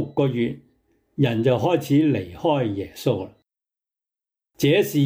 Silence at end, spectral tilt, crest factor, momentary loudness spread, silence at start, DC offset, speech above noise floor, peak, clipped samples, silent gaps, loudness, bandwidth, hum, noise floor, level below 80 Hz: 0 s; -7 dB/octave; 16 dB; 9 LU; 0 s; under 0.1%; 66 dB; -8 dBFS; under 0.1%; none; -22 LUFS; 16.5 kHz; none; -87 dBFS; -60 dBFS